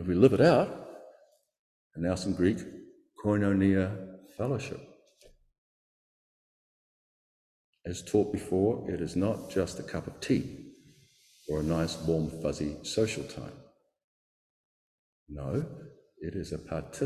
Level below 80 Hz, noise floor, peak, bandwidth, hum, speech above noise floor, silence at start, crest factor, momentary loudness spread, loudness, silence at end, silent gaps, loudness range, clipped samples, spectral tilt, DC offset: -52 dBFS; -62 dBFS; -8 dBFS; 14 kHz; none; 33 dB; 0 s; 24 dB; 20 LU; -30 LUFS; 0 s; 1.59-1.91 s, 5.58-7.73 s, 14.04-15.26 s; 11 LU; under 0.1%; -6.5 dB/octave; under 0.1%